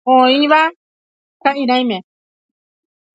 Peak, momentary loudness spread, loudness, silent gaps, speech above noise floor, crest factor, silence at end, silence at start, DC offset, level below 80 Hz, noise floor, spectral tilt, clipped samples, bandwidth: 0 dBFS; 10 LU; -14 LUFS; 0.76-1.40 s; over 77 dB; 16 dB; 1.15 s; 0.05 s; under 0.1%; -72 dBFS; under -90 dBFS; -5 dB/octave; under 0.1%; 7.8 kHz